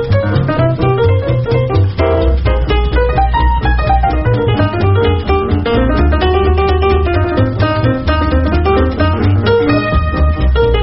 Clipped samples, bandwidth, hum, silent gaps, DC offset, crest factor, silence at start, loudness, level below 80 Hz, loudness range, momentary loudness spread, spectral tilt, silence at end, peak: under 0.1%; 5.8 kHz; none; none; under 0.1%; 12 dB; 0 s; -13 LUFS; -16 dBFS; 0 LU; 2 LU; -6 dB/octave; 0 s; 0 dBFS